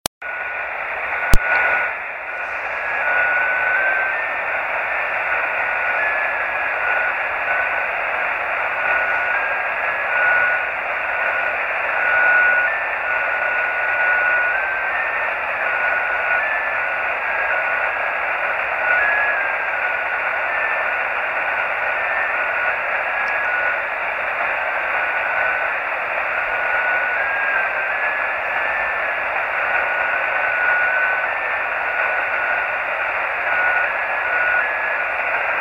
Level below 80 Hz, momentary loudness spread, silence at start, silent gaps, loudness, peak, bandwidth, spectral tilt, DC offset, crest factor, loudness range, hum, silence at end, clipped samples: -40 dBFS; 4 LU; 0.2 s; none; -19 LUFS; 0 dBFS; 16.5 kHz; -3 dB/octave; under 0.1%; 20 dB; 2 LU; none; 0 s; under 0.1%